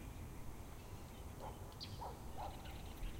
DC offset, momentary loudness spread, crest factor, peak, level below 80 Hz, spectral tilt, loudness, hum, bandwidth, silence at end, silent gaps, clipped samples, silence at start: under 0.1%; 5 LU; 14 dB; -34 dBFS; -54 dBFS; -5 dB/octave; -52 LUFS; none; 16 kHz; 0 s; none; under 0.1%; 0 s